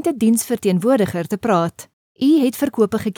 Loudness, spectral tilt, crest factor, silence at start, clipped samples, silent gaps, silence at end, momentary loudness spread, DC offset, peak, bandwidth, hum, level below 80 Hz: -18 LUFS; -6 dB/octave; 14 dB; 0 s; under 0.1%; 1.93-2.15 s; 0.05 s; 5 LU; under 0.1%; -2 dBFS; 19 kHz; none; -56 dBFS